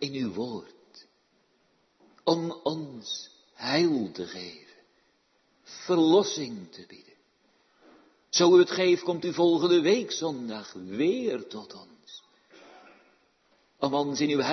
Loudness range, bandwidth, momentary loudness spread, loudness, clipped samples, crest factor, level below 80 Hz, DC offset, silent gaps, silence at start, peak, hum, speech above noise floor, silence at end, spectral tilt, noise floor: 10 LU; 6.4 kHz; 24 LU; -26 LUFS; under 0.1%; 20 dB; -78 dBFS; under 0.1%; none; 0 s; -8 dBFS; none; 43 dB; 0 s; -4.5 dB/octave; -69 dBFS